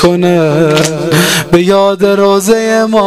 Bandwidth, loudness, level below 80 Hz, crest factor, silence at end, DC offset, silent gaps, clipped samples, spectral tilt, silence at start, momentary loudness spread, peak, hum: 16 kHz; -9 LUFS; -38 dBFS; 8 dB; 0 s; 0.9%; none; 0.6%; -5 dB/octave; 0 s; 2 LU; 0 dBFS; none